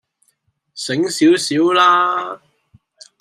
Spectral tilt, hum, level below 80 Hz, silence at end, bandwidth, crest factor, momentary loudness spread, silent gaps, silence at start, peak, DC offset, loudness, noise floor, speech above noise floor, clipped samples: -3.5 dB/octave; none; -70 dBFS; 0.85 s; 15 kHz; 16 dB; 18 LU; none; 0.75 s; -2 dBFS; under 0.1%; -15 LUFS; -65 dBFS; 50 dB; under 0.1%